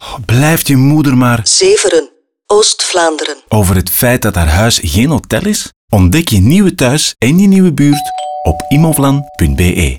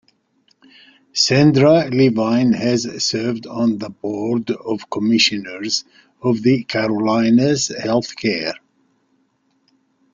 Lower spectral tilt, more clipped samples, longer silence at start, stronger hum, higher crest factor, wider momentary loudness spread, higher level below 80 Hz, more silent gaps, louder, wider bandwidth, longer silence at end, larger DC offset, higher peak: about the same, -5 dB/octave vs -5 dB/octave; neither; second, 0 s vs 1.15 s; neither; second, 10 dB vs 18 dB; second, 7 LU vs 11 LU; first, -26 dBFS vs -56 dBFS; first, 5.76-5.88 s vs none; first, -10 LUFS vs -17 LUFS; first, over 20 kHz vs 9.4 kHz; second, 0 s vs 1.55 s; neither; about the same, 0 dBFS vs 0 dBFS